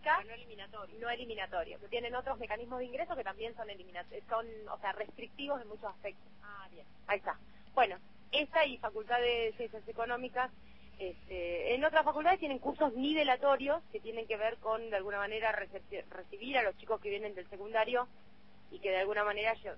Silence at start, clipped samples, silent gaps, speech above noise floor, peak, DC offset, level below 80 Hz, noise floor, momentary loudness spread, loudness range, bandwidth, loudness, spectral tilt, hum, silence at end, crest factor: 0 s; under 0.1%; none; 27 dB; -14 dBFS; 0.2%; -64 dBFS; -63 dBFS; 16 LU; 9 LU; 5.8 kHz; -36 LUFS; -6 dB/octave; none; 0 s; 22 dB